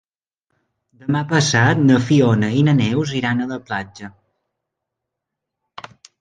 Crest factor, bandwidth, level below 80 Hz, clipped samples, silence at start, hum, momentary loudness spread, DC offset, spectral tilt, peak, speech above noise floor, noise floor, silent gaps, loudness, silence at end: 18 dB; 9.6 kHz; -54 dBFS; under 0.1%; 1.05 s; none; 23 LU; under 0.1%; -6 dB/octave; -2 dBFS; 65 dB; -81 dBFS; none; -17 LUFS; 2.1 s